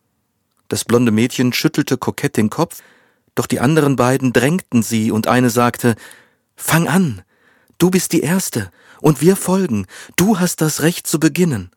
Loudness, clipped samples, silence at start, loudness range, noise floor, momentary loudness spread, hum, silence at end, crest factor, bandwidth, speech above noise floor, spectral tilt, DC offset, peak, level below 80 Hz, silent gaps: -16 LUFS; under 0.1%; 0.7 s; 2 LU; -67 dBFS; 9 LU; none; 0.1 s; 16 dB; 19 kHz; 52 dB; -5 dB/octave; under 0.1%; 0 dBFS; -52 dBFS; none